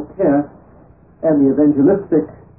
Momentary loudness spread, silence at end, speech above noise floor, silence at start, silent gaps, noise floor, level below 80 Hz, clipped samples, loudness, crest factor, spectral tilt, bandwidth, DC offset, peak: 7 LU; 0.25 s; 32 dB; 0 s; none; -46 dBFS; -48 dBFS; under 0.1%; -15 LUFS; 12 dB; -15.5 dB/octave; 2.6 kHz; 0.1%; -4 dBFS